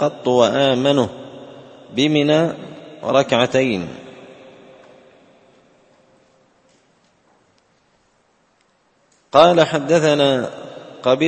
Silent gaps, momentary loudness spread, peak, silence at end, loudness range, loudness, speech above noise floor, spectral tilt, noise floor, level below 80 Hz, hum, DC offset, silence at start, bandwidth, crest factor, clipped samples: none; 23 LU; 0 dBFS; 0 s; 7 LU; -17 LUFS; 45 dB; -5.5 dB/octave; -61 dBFS; -60 dBFS; none; under 0.1%; 0 s; 8.8 kHz; 20 dB; under 0.1%